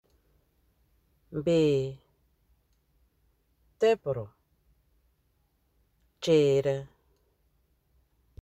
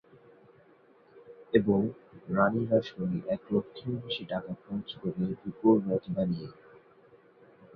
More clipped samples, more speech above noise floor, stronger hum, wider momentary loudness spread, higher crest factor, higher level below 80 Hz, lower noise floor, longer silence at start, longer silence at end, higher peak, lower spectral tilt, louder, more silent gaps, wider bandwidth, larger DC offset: neither; first, 46 dB vs 31 dB; neither; about the same, 14 LU vs 12 LU; about the same, 20 dB vs 22 dB; about the same, -64 dBFS vs -64 dBFS; first, -72 dBFS vs -60 dBFS; first, 1.3 s vs 1.15 s; first, 1.55 s vs 0.1 s; about the same, -12 dBFS vs -10 dBFS; second, -6.5 dB/octave vs -9.5 dB/octave; first, -27 LUFS vs -30 LUFS; neither; first, 12 kHz vs 6 kHz; neither